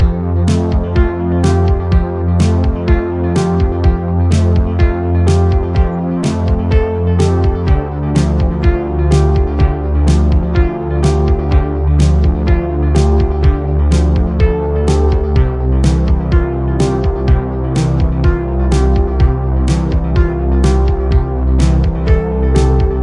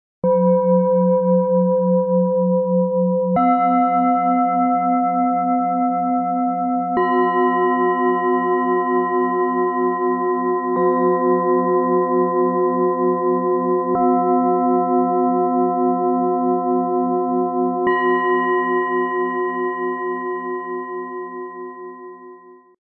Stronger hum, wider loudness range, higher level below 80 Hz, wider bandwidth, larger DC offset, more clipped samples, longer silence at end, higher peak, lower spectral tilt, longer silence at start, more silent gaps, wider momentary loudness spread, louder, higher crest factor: neither; about the same, 1 LU vs 3 LU; first, -16 dBFS vs -66 dBFS; first, 10.5 kHz vs 3.1 kHz; neither; neither; second, 0 s vs 0.25 s; first, 0 dBFS vs -6 dBFS; second, -8 dB/octave vs -13 dB/octave; second, 0 s vs 0.25 s; neither; second, 3 LU vs 7 LU; first, -14 LUFS vs -18 LUFS; about the same, 12 dB vs 12 dB